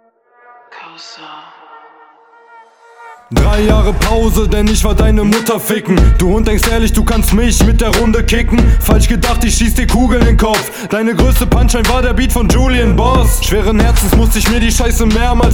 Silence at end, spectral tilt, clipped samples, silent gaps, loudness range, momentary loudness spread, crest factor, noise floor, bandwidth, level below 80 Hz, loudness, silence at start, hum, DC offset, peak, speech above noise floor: 0 s; -5 dB/octave; under 0.1%; none; 4 LU; 4 LU; 10 dB; -46 dBFS; 19 kHz; -14 dBFS; -12 LUFS; 0.7 s; none; 0.6%; 0 dBFS; 37 dB